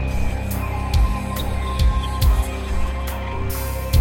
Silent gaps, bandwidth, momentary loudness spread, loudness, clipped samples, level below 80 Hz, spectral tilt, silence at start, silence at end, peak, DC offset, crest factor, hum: none; 17 kHz; 6 LU; -23 LUFS; under 0.1%; -22 dBFS; -5.5 dB/octave; 0 s; 0 s; -6 dBFS; 0.2%; 14 dB; none